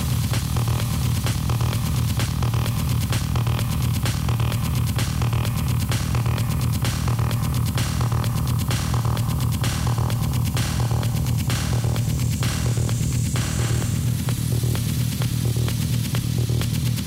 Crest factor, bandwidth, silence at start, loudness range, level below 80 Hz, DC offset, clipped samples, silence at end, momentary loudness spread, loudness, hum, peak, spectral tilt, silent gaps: 8 dB; 16.5 kHz; 0 s; 0 LU; -32 dBFS; under 0.1%; under 0.1%; 0 s; 1 LU; -23 LUFS; none; -14 dBFS; -5 dB/octave; none